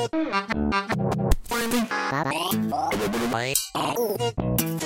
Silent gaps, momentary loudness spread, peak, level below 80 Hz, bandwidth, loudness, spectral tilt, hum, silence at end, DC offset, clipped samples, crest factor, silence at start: none; 2 LU; -4 dBFS; -36 dBFS; 17 kHz; -25 LUFS; -4.5 dB/octave; none; 0 s; under 0.1%; under 0.1%; 22 dB; 0 s